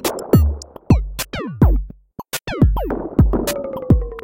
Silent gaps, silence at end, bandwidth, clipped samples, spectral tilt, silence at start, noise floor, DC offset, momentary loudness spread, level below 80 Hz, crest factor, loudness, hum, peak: none; 0 s; 17 kHz; under 0.1%; -6.5 dB/octave; 0 s; -36 dBFS; under 0.1%; 11 LU; -22 dBFS; 14 dB; -19 LUFS; none; -2 dBFS